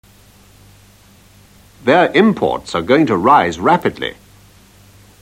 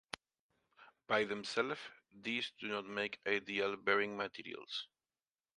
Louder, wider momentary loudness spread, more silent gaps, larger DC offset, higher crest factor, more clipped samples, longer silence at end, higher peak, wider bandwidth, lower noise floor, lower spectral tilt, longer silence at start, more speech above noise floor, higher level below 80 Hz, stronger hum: first, -14 LUFS vs -38 LUFS; second, 10 LU vs 14 LU; neither; neither; second, 16 dB vs 24 dB; neither; first, 1.1 s vs 0.75 s; first, 0 dBFS vs -16 dBFS; first, 16 kHz vs 11 kHz; second, -46 dBFS vs under -90 dBFS; first, -6 dB/octave vs -3.5 dB/octave; first, 1.85 s vs 0.8 s; second, 33 dB vs over 51 dB; first, -50 dBFS vs -82 dBFS; first, 50 Hz at -45 dBFS vs none